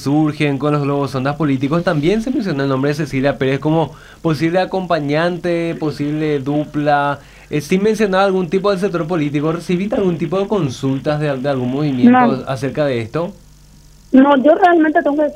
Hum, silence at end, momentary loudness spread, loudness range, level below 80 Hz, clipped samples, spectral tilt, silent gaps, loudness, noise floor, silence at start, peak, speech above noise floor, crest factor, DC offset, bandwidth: none; 0 s; 9 LU; 3 LU; -46 dBFS; under 0.1%; -7 dB/octave; none; -16 LUFS; -43 dBFS; 0 s; 0 dBFS; 28 dB; 16 dB; under 0.1%; 15 kHz